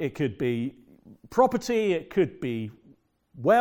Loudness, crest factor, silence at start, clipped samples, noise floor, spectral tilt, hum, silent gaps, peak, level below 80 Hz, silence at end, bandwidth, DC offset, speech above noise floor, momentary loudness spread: -27 LUFS; 20 dB; 0 s; under 0.1%; -59 dBFS; -6.5 dB/octave; none; none; -6 dBFS; -60 dBFS; 0 s; 18 kHz; under 0.1%; 33 dB; 10 LU